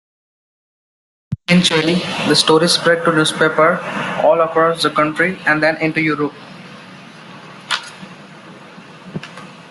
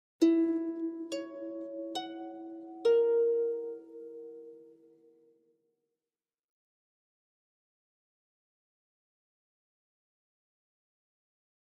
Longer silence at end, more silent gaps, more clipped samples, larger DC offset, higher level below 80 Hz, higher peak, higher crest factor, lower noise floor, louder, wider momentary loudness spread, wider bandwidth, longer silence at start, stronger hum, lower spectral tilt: second, 0 s vs 6.95 s; neither; neither; neither; first, -56 dBFS vs under -90 dBFS; first, 0 dBFS vs -14 dBFS; about the same, 18 dB vs 22 dB; second, -38 dBFS vs under -90 dBFS; first, -15 LUFS vs -31 LUFS; first, 24 LU vs 21 LU; first, 12 kHz vs 10 kHz; first, 1.3 s vs 0.2 s; neither; about the same, -4 dB/octave vs -4 dB/octave